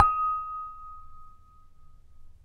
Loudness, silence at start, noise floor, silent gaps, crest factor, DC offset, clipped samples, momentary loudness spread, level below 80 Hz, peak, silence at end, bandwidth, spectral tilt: -29 LUFS; 0 s; -52 dBFS; none; 26 dB; under 0.1%; under 0.1%; 26 LU; -50 dBFS; -4 dBFS; 0.15 s; 9.6 kHz; -5.5 dB/octave